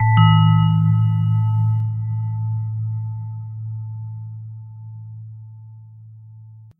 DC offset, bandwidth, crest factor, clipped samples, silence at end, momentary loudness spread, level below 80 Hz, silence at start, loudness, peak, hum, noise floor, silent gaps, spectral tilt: under 0.1%; 3.1 kHz; 18 dB; under 0.1%; 0.1 s; 23 LU; -50 dBFS; 0 s; -19 LUFS; -2 dBFS; none; -42 dBFS; none; -9.5 dB/octave